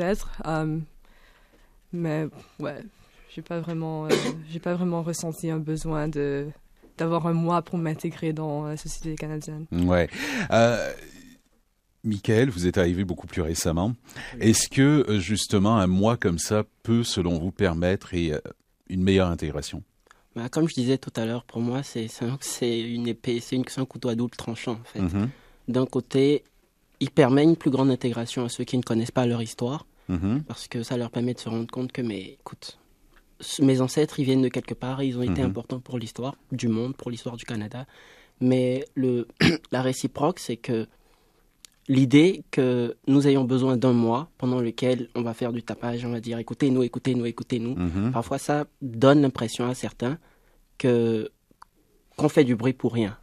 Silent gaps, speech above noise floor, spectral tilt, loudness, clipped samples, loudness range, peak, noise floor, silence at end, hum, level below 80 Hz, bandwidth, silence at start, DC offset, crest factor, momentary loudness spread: none; 42 dB; -6 dB/octave; -25 LUFS; under 0.1%; 7 LU; -2 dBFS; -67 dBFS; 0.05 s; none; -50 dBFS; 14.5 kHz; 0 s; under 0.1%; 22 dB; 13 LU